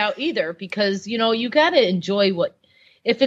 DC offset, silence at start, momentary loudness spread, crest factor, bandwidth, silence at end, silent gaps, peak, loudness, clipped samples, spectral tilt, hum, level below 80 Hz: under 0.1%; 0 s; 9 LU; 18 dB; 8 kHz; 0 s; none; -2 dBFS; -20 LUFS; under 0.1%; -5 dB/octave; none; -76 dBFS